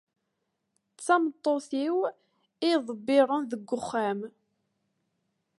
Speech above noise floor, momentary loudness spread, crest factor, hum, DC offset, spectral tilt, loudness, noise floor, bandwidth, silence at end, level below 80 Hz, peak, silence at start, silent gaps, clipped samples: 53 dB; 10 LU; 20 dB; none; under 0.1%; -4.5 dB/octave; -28 LUFS; -80 dBFS; 11.5 kHz; 1.3 s; -78 dBFS; -10 dBFS; 1 s; none; under 0.1%